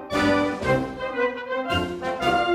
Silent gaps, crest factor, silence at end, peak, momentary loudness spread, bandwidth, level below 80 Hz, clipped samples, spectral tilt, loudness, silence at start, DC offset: none; 14 dB; 0 s; -8 dBFS; 7 LU; 15.5 kHz; -46 dBFS; under 0.1%; -5.5 dB/octave; -24 LUFS; 0 s; under 0.1%